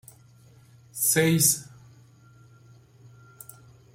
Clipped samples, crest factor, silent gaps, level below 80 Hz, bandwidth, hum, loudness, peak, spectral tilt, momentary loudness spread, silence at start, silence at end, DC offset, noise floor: under 0.1%; 22 dB; none; -64 dBFS; 16.5 kHz; none; -22 LUFS; -8 dBFS; -3.5 dB/octave; 26 LU; 0.95 s; 2.3 s; under 0.1%; -54 dBFS